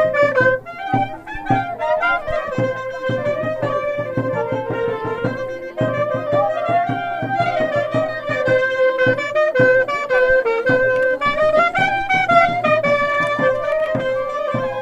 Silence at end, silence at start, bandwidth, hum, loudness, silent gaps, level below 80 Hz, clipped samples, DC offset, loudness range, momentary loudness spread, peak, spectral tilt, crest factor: 0 s; 0 s; 9 kHz; none; -18 LUFS; none; -46 dBFS; under 0.1%; under 0.1%; 6 LU; 8 LU; -2 dBFS; -6.5 dB/octave; 16 dB